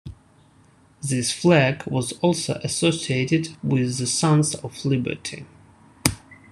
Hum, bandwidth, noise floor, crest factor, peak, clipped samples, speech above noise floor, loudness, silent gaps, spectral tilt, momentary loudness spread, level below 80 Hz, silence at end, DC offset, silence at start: none; 13 kHz; -55 dBFS; 24 dB; 0 dBFS; under 0.1%; 33 dB; -22 LUFS; none; -4.5 dB/octave; 13 LU; -52 dBFS; 0.15 s; under 0.1%; 0.05 s